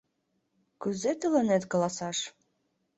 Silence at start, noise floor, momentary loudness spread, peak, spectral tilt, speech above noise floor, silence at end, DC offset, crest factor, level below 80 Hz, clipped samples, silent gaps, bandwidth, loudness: 0.8 s; -77 dBFS; 10 LU; -14 dBFS; -4.5 dB/octave; 49 dB; 0.65 s; under 0.1%; 18 dB; -72 dBFS; under 0.1%; none; 8.4 kHz; -29 LUFS